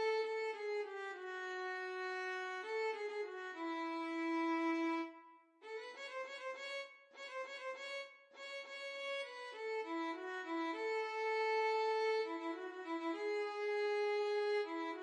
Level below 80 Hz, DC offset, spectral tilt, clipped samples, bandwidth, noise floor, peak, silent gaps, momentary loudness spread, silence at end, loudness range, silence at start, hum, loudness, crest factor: under -90 dBFS; under 0.1%; -1.5 dB/octave; under 0.1%; 10.5 kHz; -62 dBFS; -28 dBFS; none; 11 LU; 0 s; 8 LU; 0 s; none; -41 LUFS; 12 dB